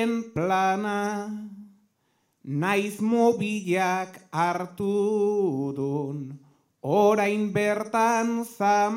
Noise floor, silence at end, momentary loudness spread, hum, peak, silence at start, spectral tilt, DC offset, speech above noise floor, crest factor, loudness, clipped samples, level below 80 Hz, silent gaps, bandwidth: -71 dBFS; 0 s; 11 LU; none; -8 dBFS; 0 s; -6 dB/octave; under 0.1%; 47 dB; 18 dB; -25 LUFS; under 0.1%; -70 dBFS; none; 16.5 kHz